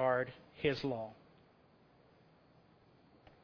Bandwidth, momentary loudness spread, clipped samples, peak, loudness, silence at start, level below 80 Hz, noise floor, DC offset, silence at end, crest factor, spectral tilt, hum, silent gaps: 5.4 kHz; 14 LU; under 0.1%; -18 dBFS; -38 LUFS; 0 s; -68 dBFS; -67 dBFS; under 0.1%; 2.3 s; 22 dB; -4 dB/octave; none; none